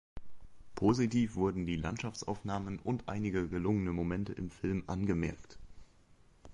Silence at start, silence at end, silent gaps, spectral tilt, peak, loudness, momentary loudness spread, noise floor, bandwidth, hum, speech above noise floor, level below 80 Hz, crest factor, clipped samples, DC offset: 0.15 s; 0 s; none; -7 dB/octave; -18 dBFS; -35 LUFS; 8 LU; -63 dBFS; 11 kHz; none; 28 dB; -52 dBFS; 18 dB; under 0.1%; under 0.1%